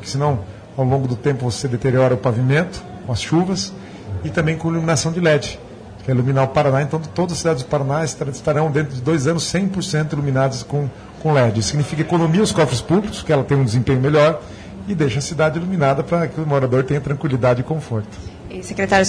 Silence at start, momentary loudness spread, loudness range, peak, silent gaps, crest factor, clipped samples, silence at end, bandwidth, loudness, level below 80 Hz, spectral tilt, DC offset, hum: 0 s; 11 LU; 2 LU; -2 dBFS; none; 16 dB; under 0.1%; 0 s; 10.5 kHz; -19 LUFS; -44 dBFS; -6 dB/octave; under 0.1%; none